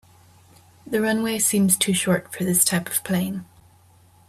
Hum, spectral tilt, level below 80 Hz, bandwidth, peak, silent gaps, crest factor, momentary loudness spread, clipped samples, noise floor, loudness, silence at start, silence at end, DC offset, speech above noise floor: none; -3.5 dB/octave; -62 dBFS; 16 kHz; -4 dBFS; none; 20 dB; 8 LU; under 0.1%; -54 dBFS; -21 LUFS; 0.85 s; 0.85 s; under 0.1%; 32 dB